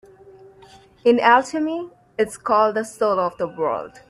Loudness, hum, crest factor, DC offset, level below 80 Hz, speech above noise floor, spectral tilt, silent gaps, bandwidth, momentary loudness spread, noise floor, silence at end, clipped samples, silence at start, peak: -20 LUFS; none; 20 dB; under 0.1%; -62 dBFS; 29 dB; -4.5 dB/octave; none; 12.5 kHz; 10 LU; -49 dBFS; 0.2 s; under 0.1%; 1.05 s; 0 dBFS